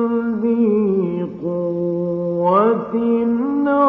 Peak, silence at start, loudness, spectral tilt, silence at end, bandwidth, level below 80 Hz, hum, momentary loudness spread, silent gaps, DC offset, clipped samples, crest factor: -2 dBFS; 0 s; -18 LUFS; -11 dB/octave; 0 s; 3.7 kHz; -58 dBFS; none; 7 LU; none; under 0.1%; under 0.1%; 16 dB